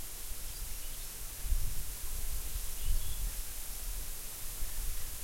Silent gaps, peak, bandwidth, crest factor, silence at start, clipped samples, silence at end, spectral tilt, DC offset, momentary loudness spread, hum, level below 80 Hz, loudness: none; -18 dBFS; 16.5 kHz; 16 dB; 0 s; under 0.1%; 0 s; -2 dB/octave; under 0.1%; 4 LU; none; -38 dBFS; -40 LUFS